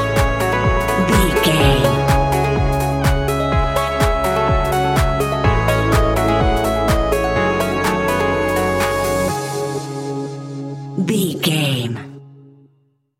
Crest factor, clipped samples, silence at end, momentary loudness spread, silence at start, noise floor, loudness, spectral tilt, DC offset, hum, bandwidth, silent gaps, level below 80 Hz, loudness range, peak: 16 dB; under 0.1%; 0.85 s; 10 LU; 0 s; -60 dBFS; -17 LUFS; -5.5 dB/octave; under 0.1%; none; 17 kHz; none; -26 dBFS; 5 LU; -2 dBFS